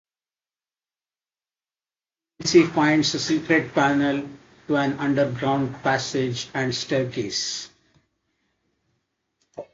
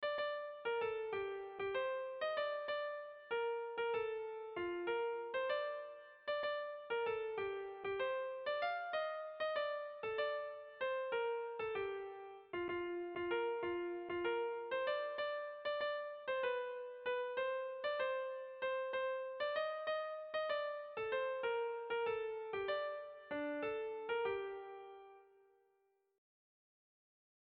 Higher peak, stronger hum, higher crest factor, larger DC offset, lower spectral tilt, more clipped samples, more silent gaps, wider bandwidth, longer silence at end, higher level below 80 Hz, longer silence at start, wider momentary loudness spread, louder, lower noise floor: first, -4 dBFS vs -28 dBFS; neither; first, 22 dB vs 14 dB; neither; first, -4.5 dB/octave vs -0.5 dB/octave; neither; neither; first, 7.8 kHz vs 5.2 kHz; second, 0.1 s vs 2.3 s; first, -60 dBFS vs -78 dBFS; first, 2.4 s vs 0 s; first, 10 LU vs 6 LU; first, -22 LUFS vs -41 LUFS; first, under -90 dBFS vs -79 dBFS